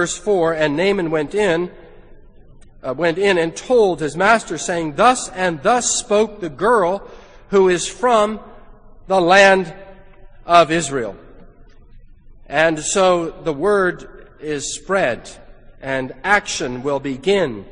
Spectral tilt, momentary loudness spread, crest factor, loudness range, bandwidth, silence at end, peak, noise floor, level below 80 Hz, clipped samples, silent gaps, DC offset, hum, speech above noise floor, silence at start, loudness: -3.5 dB/octave; 11 LU; 18 dB; 4 LU; 10 kHz; 0 s; 0 dBFS; -43 dBFS; -44 dBFS; under 0.1%; none; under 0.1%; none; 26 dB; 0 s; -17 LUFS